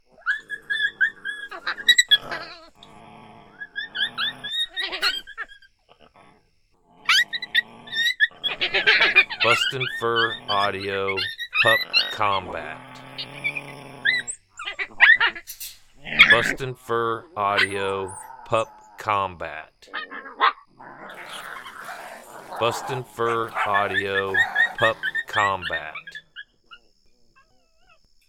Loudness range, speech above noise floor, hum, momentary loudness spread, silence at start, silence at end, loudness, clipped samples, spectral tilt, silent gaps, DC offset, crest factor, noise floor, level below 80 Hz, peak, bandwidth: 9 LU; 38 dB; none; 20 LU; 0.25 s; 1.55 s; -21 LUFS; under 0.1%; -2 dB/octave; none; under 0.1%; 24 dB; -62 dBFS; -56 dBFS; 0 dBFS; 19 kHz